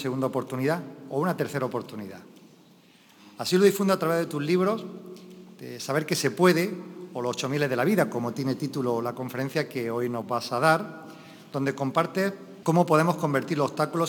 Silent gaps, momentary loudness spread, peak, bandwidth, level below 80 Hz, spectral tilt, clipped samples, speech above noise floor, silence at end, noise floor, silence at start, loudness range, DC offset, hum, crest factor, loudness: none; 17 LU; -6 dBFS; 19.5 kHz; -76 dBFS; -5.5 dB/octave; under 0.1%; 30 dB; 0 s; -56 dBFS; 0 s; 2 LU; under 0.1%; none; 20 dB; -26 LUFS